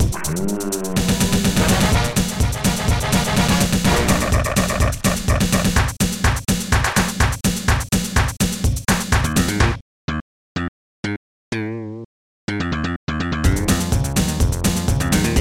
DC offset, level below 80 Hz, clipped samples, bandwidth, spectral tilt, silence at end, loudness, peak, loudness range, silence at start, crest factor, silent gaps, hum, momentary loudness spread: 0.8%; -26 dBFS; under 0.1%; 17 kHz; -4.5 dB/octave; 0 s; -19 LUFS; -2 dBFS; 7 LU; 0 s; 16 dB; 9.81-10.08 s, 10.21-10.55 s, 10.68-11.03 s, 11.16-11.52 s, 12.05-12.48 s, 12.96-13.07 s; none; 11 LU